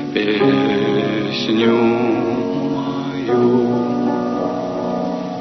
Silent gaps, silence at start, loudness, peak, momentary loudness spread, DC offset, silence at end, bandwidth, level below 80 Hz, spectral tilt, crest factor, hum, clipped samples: none; 0 s; -18 LUFS; -2 dBFS; 7 LU; under 0.1%; 0 s; 6.2 kHz; -54 dBFS; -7 dB/octave; 14 dB; none; under 0.1%